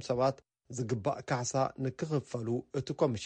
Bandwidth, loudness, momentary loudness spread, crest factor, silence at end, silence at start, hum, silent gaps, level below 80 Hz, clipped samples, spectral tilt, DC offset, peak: 9.6 kHz; -34 LUFS; 7 LU; 18 dB; 0 s; 0 s; none; none; -66 dBFS; under 0.1%; -6 dB/octave; under 0.1%; -14 dBFS